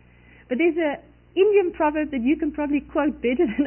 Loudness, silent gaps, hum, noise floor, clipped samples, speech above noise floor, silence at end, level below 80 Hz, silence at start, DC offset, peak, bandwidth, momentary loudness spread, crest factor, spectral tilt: -23 LUFS; none; none; -51 dBFS; under 0.1%; 30 dB; 0 s; -50 dBFS; 0.5 s; under 0.1%; -8 dBFS; 3.2 kHz; 8 LU; 14 dB; -10 dB/octave